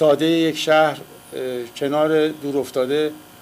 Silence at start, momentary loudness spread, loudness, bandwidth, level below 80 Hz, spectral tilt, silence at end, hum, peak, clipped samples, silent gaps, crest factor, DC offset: 0 s; 11 LU; -20 LUFS; 16 kHz; -66 dBFS; -5 dB/octave; 0.2 s; none; -6 dBFS; under 0.1%; none; 14 dB; under 0.1%